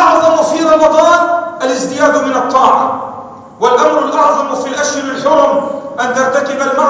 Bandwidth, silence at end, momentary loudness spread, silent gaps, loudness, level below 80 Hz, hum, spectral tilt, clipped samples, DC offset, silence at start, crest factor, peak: 8 kHz; 0 s; 8 LU; none; -11 LUFS; -52 dBFS; none; -3 dB/octave; 0.3%; under 0.1%; 0 s; 10 dB; 0 dBFS